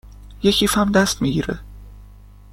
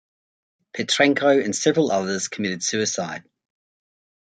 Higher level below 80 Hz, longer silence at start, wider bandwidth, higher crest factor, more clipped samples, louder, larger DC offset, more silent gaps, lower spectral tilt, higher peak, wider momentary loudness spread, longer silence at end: first, -38 dBFS vs -66 dBFS; second, 0.05 s vs 0.75 s; first, 16.5 kHz vs 9.6 kHz; about the same, 18 dB vs 22 dB; neither; first, -18 LUFS vs -21 LUFS; neither; neither; about the same, -4 dB/octave vs -3 dB/octave; about the same, -4 dBFS vs -2 dBFS; second, 10 LU vs 13 LU; second, 0.4 s vs 1.15 s